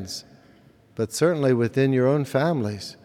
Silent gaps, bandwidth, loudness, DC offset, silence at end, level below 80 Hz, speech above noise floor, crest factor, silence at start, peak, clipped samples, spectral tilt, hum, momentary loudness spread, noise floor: none; 16 kHz; -22 LUFS; under 0.1%; 0.15 s; -66 dBFS; 32 dB; 16 dB; 0 s; -8 dBFS; under 0.1%; -6 dB/octave; none; 14 LU; -54 dBFS